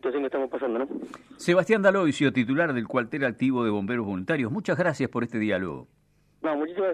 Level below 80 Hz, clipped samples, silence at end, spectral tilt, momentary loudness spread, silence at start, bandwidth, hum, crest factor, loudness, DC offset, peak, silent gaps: -66 dBFS; under 0.1%; 0 s; -6.5 dB/octave; 10 LU; 0.05 s; 11 kHz; 50 Hz at -60 dBFS; 18 dB; -26 LUFS; under 0.1%; -8 dBFS; none